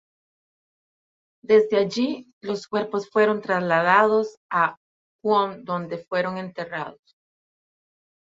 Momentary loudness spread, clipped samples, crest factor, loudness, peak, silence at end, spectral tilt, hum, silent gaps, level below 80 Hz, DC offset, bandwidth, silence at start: 13 LU; under 0.1%; 22 dB; -23 LUFS; -4 dBFS; 1.35 s; -6 dB/octave; none; 2.33-2.41 s, 4.37-4.49 s, 4.77-5.19 s; -70 dBFS; under 0.1%; 7.6 kHz; 1.5 s